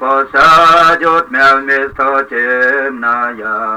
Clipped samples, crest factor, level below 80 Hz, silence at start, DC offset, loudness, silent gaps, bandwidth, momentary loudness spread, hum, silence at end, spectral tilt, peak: under 0.1%; 10 dB; -44 dBFS; 0 s; under 0.1%; -10 LUFS; none; 16.5 kHz; 9 LU; none; 0 s; -3.5 dB/octave; -2 dBFS